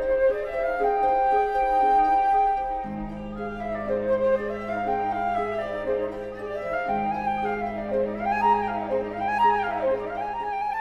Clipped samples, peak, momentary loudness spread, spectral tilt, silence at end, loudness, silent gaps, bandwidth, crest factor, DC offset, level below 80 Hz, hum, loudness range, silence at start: under 0.1%; -10 dBFS; 10 LU; -7 dB/octave; 0 s; -25 LUFS; none; 11.5 kHz; 14 dB; under 0.1%; -48 dBFS; none; 4 LU; 0 s